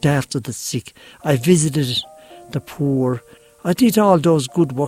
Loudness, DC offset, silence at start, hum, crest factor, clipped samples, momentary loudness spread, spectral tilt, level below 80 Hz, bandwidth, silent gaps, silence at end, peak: -18 LUFS; under 0.1%; 0.05 s; none; 18 dB; under 0.1%; 14 LU; -5.5 dB/octave; -52 dBFS; 16 kHz; none; 0 s; -2 dBFS